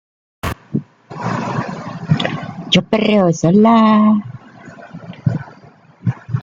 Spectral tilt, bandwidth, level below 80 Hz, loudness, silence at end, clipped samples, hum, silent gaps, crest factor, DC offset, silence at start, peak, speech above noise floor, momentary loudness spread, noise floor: -6.5 dB/octave; 7.6 kHz; -46 dBFS; -16 LUFS; 0 s; under 0.1%; none; none; 16 dB; under 0.1%; 0.45 s; 0 dBFS; 33 dB; 24 LU; -44 dBFS